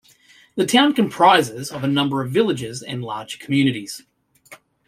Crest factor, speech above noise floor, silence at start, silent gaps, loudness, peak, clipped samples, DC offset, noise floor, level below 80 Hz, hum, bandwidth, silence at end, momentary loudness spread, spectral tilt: 18 dB; 33 dB; 0.55 s; none; -19 LUFS; -2 dBFS; under 0.1%; under 0.1%; -52 dBFS; -62 dBFS; none; 16 kHz; 0.35 s; 16 LU; -4.5 dB/octave